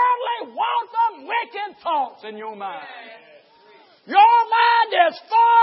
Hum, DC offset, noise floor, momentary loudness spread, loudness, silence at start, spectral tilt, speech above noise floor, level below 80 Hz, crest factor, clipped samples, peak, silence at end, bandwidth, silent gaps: none; under 0.1%; -51 dBFS; 19 LU; -19 LUFS; 0 s; -5.5 dB/octave; 33 dB; -86 dBFS; 16 dB; under 0.1%; -2 dBFS; 0 s; 5.8 kHz; none